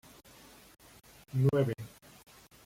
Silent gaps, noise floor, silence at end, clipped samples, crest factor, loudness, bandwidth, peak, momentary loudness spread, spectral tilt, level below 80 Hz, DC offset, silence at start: none; -56 dBFS; 0.8 s; under 0.1%; 20 dB; -31 LUFS; 16 kHz; -16 dBFS; 27 LU; -8 dB/octave; -66 dBFS; under 0.1%; 1.35 s